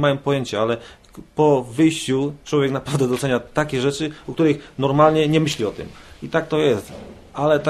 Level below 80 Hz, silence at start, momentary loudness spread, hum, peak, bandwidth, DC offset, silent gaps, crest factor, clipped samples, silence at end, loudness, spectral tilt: -50 dBFS; 0 s; 12 LU; none; -2 dBFS; 13 kHz; under 0.1%; none; 18 dB; under 0.1%; 0 s; -20 LUFS; -6 dB/octave